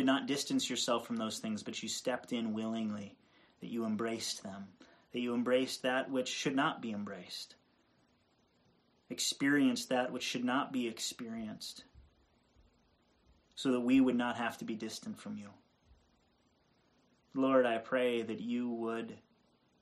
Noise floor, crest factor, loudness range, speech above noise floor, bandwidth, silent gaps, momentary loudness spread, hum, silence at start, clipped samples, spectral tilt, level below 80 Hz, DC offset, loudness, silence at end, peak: -73 dBFS; 20 dB; 5 LU; 38 dB; 13 kHz; none; 16 LU; none; 0 s; under 0.1%; -3.5 dB/octave; -74 dBFS; under 0.1%; -35 LUFS; 0.65 s; -16 dBFS